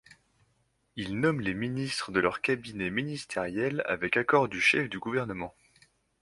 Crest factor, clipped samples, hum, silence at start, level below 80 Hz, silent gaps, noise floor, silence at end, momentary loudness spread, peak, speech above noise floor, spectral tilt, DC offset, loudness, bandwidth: 22 dB; under 0.1%; none; 0.95 s; -60 dBFS; none; -72 dBFS; 0.7 s; 12 LU; -8 dBFS; 43 dB; -5 dB/octave; under 0.1%; -29 LUFS; 11.5 kHz